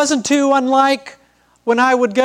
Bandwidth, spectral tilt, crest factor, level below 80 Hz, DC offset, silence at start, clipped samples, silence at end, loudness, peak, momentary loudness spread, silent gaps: 13.5 kHz; -2.5 dB/octave; 14 dB; -64 dBFS; under 0.1%; 0 s; under 0.1%; 0 s; -15 LUFS; -2 dBFS; 7 LU; none